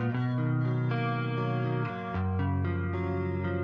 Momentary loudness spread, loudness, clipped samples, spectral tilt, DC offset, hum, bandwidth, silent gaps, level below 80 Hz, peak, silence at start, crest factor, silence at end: 3 LU; -30 LUFS; under 0.1%; -10 dB/octave; under 0.1%; none; 5.2 kHz; none; -56 dBFS; -18 dBFS; 0 s; 12 dB; 0 s